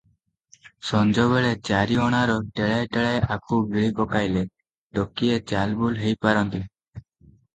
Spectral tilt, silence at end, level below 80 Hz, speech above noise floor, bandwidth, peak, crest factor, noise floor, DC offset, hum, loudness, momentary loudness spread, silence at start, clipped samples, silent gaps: -6.5 dB/octave; 0.55 s; -48 dBFS; 44 dB; 9 kHz; -4 dBFS; 20 dB; -67 dBFS; under 0.1%; none; -23 LUFS; 8 LU; 0.65 s; under 0.1%; 4.78-4.90 s, 6.88-6.93 s